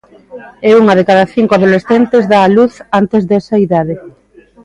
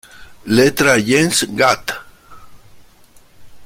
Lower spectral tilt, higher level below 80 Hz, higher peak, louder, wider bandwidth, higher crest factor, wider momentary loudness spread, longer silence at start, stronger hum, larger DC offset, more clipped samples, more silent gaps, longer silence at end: first, -7.5 dB/octave vs -3.5 dB/octave; about the same, -50 dBFS vs -48 dBFS; about the same, 0 dBFS vs 0 dBFS; first, -10 LUFS vs -14 LUFS; second, 10.5 kHz vs 16.5 kHz; second, 10 dB vs 16 dB; second, 7 LU vs 15 LU; about the same, 0.3 s vs 0.2 s; neither; neither; neither; neither; first, 0.55 s vs 0 s